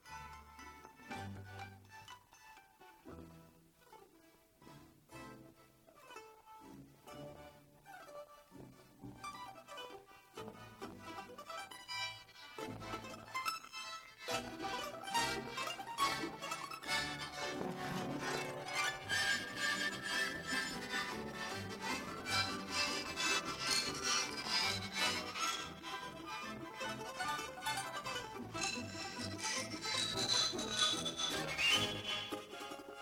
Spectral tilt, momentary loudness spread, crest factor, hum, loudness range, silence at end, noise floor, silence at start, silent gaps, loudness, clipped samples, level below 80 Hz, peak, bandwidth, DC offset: -1.5 dB/octave; 21 LU; 22 dB; none; 21 LU; 0 s; -67 dBFS; 0.05 s; none; -39 LUFS; under 0.1%; -68 dBFS; -20 dBFS; 19 kHz; under 0.1%